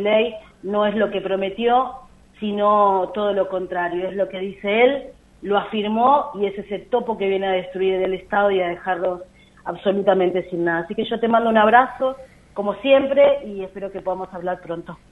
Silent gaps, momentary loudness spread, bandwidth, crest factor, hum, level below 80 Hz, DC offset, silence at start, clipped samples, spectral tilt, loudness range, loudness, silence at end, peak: none; 13 LU; 4.1 kHz; 20 dB; none; -54 dBFS; under 0.1%; 0 s; under 0.1%; -7 dB/octave; 3 LU; -20 LUFS; 0.15 s; 0 dBFS